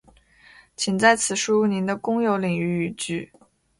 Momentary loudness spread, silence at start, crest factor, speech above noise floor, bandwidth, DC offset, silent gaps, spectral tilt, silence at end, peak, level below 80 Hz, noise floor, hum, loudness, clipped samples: 11 LU; 0.8 s; 22 dB; 31 dB; 11.5 kHz; under 0.1%; none; -4 dB/octave; 0.55 s; -2 dBFS; -60 dBFS; -54 dBFS; none; -22 LUFS; under 0.1%